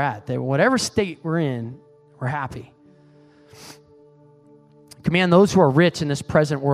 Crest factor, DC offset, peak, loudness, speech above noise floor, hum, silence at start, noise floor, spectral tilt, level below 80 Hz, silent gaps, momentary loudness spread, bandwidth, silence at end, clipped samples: 20 dB; under 0.1%; -2 dBFS; -20 LUFS; 32 dB; none; 0 s; -51 dBFS; -6 dB/octave; -52 dBFS; none; 15 LU; 13.5 kHz; 0 s; under 0.1%